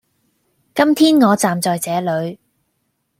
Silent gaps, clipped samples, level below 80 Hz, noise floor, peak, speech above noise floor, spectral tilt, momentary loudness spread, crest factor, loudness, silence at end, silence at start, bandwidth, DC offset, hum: none; under 0.1%; -64 dBFS; -69 dBFS; -2 dBFS; 54 dB; -4.5 dB/octave; 12 LU; 16 dB; -16 LUFS; 0.85 s; 0.75 s; 16 kHz; under 0.1%; none